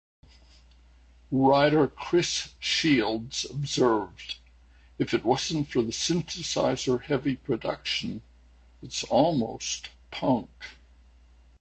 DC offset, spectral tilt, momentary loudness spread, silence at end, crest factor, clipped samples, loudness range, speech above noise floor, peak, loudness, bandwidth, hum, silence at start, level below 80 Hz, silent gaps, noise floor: under 0.1%; -4.5 dB/octave; 14 LU; 0.9 s; 20 dB; under 0.1%; 5 LU; 30 dB; -8 dBFS; -27 LUFS; 9 kHz; none; 1.3 s; -54 dBFS; none; -56 dBFS